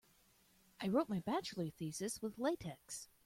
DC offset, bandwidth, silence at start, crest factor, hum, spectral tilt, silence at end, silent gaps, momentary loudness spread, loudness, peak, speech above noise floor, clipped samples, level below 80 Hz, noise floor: under 0.1%; 16.5 kHz; 0.8 s; 20 dB; none; -5 dB/octave; 0.2 s; none; 10 LU; -41 LUFS; -22 dBFS; 31 dB; under 0.1%; -72 dBFS; -71 dBFS